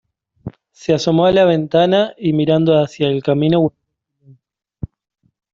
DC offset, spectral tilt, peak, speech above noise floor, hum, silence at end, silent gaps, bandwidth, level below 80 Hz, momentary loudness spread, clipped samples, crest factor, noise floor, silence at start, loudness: under 0.1%; -7 dB/octave; -2 dBFS; 41 dB; none; 1.85 s; none; 7.6 kHz; -50 dBFS; 20 LU; under 0.1%; 14 dB; -55 dBFS; 0.45 s; -15 LUFS